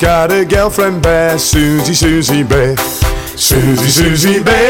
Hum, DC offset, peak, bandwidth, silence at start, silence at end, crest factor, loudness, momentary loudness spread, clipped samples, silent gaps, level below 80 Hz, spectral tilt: none; 0.2%; -2 dBFS; 18 kHz; 0 s; 0 s; 8 dB; -10 LUFS; 4 LU; under 0.1%; none; -22 dBFS; -4 dB/octave